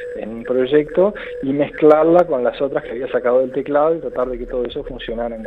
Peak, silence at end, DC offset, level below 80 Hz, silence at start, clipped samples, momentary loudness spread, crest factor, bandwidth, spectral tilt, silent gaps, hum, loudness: 0 dBFS; 0 s; under 0.1%; -42 dBFS; 0 s; under 0.1%; 13 LU; 18 dB; 4.8 kHz; -8.5 dB/octave; none; none; -18 LUFS